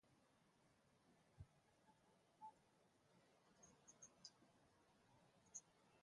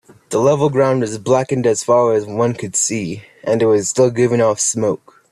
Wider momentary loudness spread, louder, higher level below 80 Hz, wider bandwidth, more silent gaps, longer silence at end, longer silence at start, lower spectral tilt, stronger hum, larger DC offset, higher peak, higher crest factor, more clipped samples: about the same, 8 LU vs 7 LU; second, -65 LUFS vs -16 LUFS; second, -84 dBFS vs -56 dBFS; second, 11 kHz vs 13 kHz; neither; second, 0 s vs 0.35 s; second, 0.05 s vs 0.3 s; second, -2.5 dB/octave vs -5 dB/octave; neither; neither; second, -44 dBFS vs -2 dBFS; first, 26 dB vs 14 dB; neither